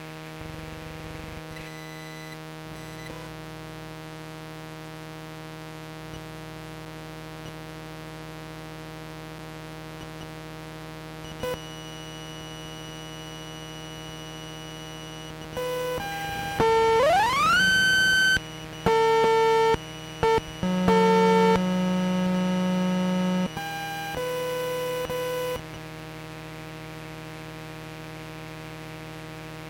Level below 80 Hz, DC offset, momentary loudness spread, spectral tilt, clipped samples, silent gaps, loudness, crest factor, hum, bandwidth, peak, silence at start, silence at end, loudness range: -50 dBFS; under 0.1%; 19 LU; -4.5 dB/octave; under 0.1%; none; -23 LUFS; 22 dB; 60 Hz at -50 dBFS; 17 kHz; -6 dBFS; 0 s; 0 s; 18 LU